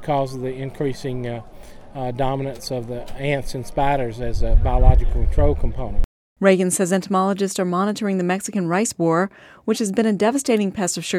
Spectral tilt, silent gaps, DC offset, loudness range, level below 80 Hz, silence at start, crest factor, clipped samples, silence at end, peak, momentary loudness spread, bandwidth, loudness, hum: -5.5 dB/octave; 6.05-6.36 s; under 0.1%; 6 LU; -24 dBFS; 0 s; 20 dB; under 0.1%; 0 s; 0 dBFS; 11 LU; 14.5 kHz; -22 LUFS; none